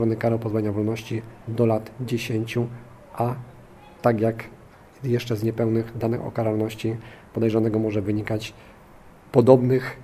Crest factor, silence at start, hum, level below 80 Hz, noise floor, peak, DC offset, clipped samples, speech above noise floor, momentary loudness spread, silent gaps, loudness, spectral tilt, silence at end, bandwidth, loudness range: 24 dB; 0 s; none; -54 dBFS; -48 dBFS; 0 dBFS; under 0.1%; under 0.1%; 25 dB; 13 LU; none; -24 LUFS; -8 dB/octave; 0 s; 15 kHz; 4 LU